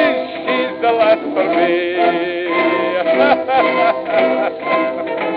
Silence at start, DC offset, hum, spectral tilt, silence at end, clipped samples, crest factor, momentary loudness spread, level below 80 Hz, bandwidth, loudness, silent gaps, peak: 0 s; under 0.1%; none; -8 dB/octave; 0 s; under 0.1%; 14 dB; 5 LU; -62 dBFS; 5.2 kHz; -15 LUFS; none; 0 dBFS